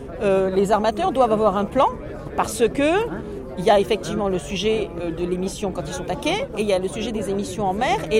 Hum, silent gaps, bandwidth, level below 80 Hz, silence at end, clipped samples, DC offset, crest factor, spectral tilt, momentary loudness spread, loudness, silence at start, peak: none; none; 16 kHz; -40 dBFS; 0 s; under 0.1%; under 0.1%; 16 dB; -5 dB/octave; 9 LU; -22 LUFS; 0 s; -6 dBFS